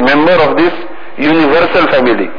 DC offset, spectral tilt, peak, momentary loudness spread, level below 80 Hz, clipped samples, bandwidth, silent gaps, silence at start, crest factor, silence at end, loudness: 10%; -7 dB/octave; 0 dBFS; 9 LU; -40 dBFS; under 0.1%; 5.4 kHz; none; 0 s; 8 dB; 0 s; -9 LUFS